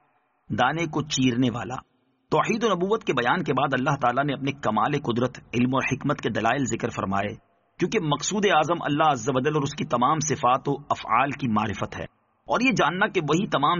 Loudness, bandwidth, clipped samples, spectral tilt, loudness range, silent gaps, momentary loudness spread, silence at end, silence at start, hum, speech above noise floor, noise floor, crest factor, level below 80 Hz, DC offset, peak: -24 LUFS; 7.2 kHz; under 0.1%; -4 dB/octave; 2 LU; none; 6 LU; 0 s; 0.5 s; none; 38 dB; -62 dBFS; 18 dB; -56 dBFS; under 0.1%; -6 dBFS